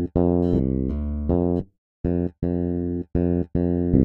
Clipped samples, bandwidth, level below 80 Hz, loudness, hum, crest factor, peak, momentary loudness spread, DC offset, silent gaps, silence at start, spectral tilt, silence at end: under 0.1%; 4.2 kHz; -32 dBFS; -24 LUFS; none; 18 dB; -4 dBFS; 6 LU; under 0.1%; 1.78-2.04 s; 0 s; -13 dB/octave; 0 s